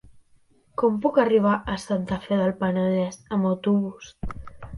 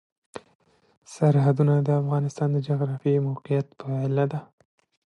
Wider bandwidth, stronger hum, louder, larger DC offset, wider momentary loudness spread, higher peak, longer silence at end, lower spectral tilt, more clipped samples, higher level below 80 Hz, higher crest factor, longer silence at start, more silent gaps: first, 11.5 kHz vs 9.2 kHz; neither; about the same, -24 LUFS vs -24 LUFS; neither; second, 17 LU vs 24 LU; about the same, -6 dBFS vs -8 dBFS; second, 0 s vs 0.65 s; second, -7 dB/octave vs -9 dB/octave; neither; first, -46 dBFS vs -70 dBFS; about the same, 18 dB vs 16 dB; first, 0.8 s vs 0.35 s; second, none vs 0.55-0.60 s, 0.97-1.02 s